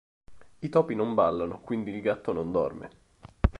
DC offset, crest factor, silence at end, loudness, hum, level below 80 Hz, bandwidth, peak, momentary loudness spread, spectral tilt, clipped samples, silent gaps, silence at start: under 0.1%; 22 dB; 0 s; -29 LUFS; none; -38 dBFS; 10.5 kHz; -6 dBFS; 11 LU; -9 dB/octave; under 0.1%; none; 0.3 s